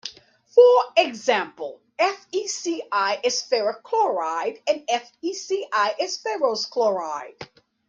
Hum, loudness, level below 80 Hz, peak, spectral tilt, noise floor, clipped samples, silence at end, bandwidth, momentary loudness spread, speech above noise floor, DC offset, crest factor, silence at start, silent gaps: none; -22 LUFS; -74 dBFS; -4 dBFS; -1.5 dB/octave; -49 dBFS; under 0.1%; 0.45 s; 7.6 kHz; 15 LU; 27 dB; under 0.1%; 20 dB; 0.05 s; none